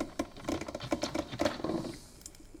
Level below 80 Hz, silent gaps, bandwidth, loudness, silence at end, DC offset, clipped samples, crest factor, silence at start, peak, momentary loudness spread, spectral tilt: -54 dBFS; none; 18 kHz; -36 LUFS; 0 s; under 0.1%; under 0.1%; 22 dB; 0 s; -16 dBFS; 15 LU; -4.5 dB/octave